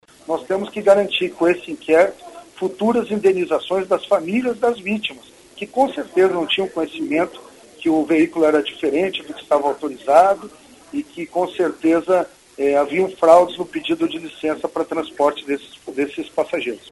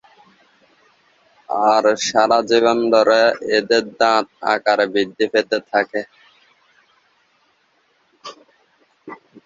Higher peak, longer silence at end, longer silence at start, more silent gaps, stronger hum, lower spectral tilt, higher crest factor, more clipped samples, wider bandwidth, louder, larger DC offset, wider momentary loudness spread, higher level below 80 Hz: about the same, 0 dBFS vs -2 dBFS; second, 0 s vs 0.3 s; second, 0.3 s vs 1.5 s; neither; neither; first, -5 dB/octave vs -3 dB/octave; about the same, 18 dB vs 18 dB; neither; first, 11.5 kHz vs 7.8 kHz; about the same, -19 LUFS vs -17 LUFS; neither; second, 11 LU vs 23 LU; about the same, -60 dBFS vs -64 dBFS